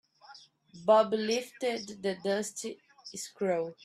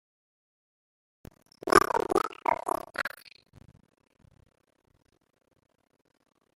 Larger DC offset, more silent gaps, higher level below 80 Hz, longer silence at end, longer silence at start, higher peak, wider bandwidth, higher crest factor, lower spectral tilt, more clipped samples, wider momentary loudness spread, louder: neither; neither; second, -78 dBFS vs -60 dBFS; second, 0.1 s vs 3.5 s; second, 0.3 s vs 1.65 s; second, -12 dBFS vs -4 dBFS; second, 14 kHz vs 16 kHz; second, 20 dB vs 30 dB; about the same, -4 dB/octave vs -3.5 dB/octave; neither; about the same, 17 LU vs 15 LU; second, -31 LUFS vs -27 LUFS